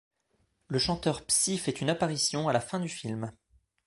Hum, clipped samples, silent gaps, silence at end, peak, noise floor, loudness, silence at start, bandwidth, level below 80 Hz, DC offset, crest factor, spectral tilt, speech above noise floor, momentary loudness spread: none; under 0.1%; none; 0.55 s; -10 dBFS; -74 dBFS; -29 LUFS; 0.7 s; 12 kHz; -58 dBFS; under 0.1%; 20 dB; -3.5 dB/octave; 44 dB; 10 LU